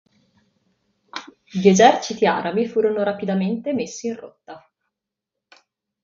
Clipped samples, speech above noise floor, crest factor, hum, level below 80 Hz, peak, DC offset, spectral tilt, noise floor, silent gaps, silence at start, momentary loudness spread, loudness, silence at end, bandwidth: under 0.1%; 65 dB; 22 dB; none; -66 dBFS; 0 dBFS; under 0.1%; -5 dB/octave; -84 dBFS; none; 1.15 s; 22 LU; -19 LUFS; 1.45 s; 7.6 kHz